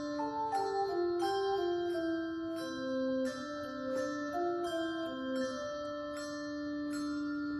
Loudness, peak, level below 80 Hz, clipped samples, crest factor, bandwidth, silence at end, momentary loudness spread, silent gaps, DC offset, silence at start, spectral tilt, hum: -36 LUFS; -22 dBFS; -68 dBFS; under 0.1%; 14 dB; 13.5 kHz; 0 s; 7 LU; none; under 0.1%; 0 s; -4.5 dB/octave; none